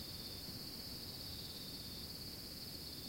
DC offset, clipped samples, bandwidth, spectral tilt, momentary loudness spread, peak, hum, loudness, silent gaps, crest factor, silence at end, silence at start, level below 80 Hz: under 0.1%; under 0.1%; 16.5 kHz; -3 dB/octave; 1 LU; -36 dBFS; none; -46 LUFS; none; 14 dB; 0 s; 0 s; -62 dBFS